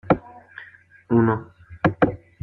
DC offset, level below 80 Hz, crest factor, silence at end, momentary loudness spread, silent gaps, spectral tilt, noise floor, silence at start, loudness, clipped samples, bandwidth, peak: under 0.1%; -50 dBFS; 22 dB; 0.25 s; 22 LU; none; -10 dB/octave; -48 dBFS; 0.05 s; -22 LUFS; under 0.1%; 5.8 kHz; -2 dBFS